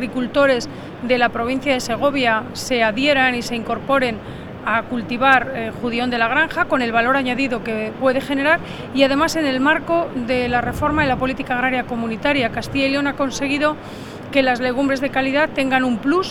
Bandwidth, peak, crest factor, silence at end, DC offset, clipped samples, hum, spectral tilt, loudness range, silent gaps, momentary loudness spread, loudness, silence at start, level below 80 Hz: 16 kHz; 0 dBFS; 18 dB; 0 s; under 0.1%; under 0.1%; none; -4.5 dB/octave; 2 LU; none; 7 LU; -19 LUFS; 0 s; -42 dBFS